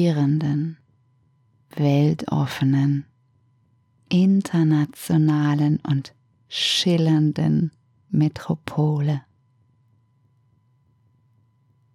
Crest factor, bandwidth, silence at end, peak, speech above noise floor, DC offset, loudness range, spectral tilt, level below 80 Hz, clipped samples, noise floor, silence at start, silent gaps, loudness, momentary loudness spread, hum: 16 dB; 14 kHz; 2.75 s; -6 dBFS; 42 dB; under 0.1%; 6 LU; -6.5 dB/octave; -62 dBFS; under 0.1%; -62 dBFS; 0 s; none; -21 LUFS; 9 LU; none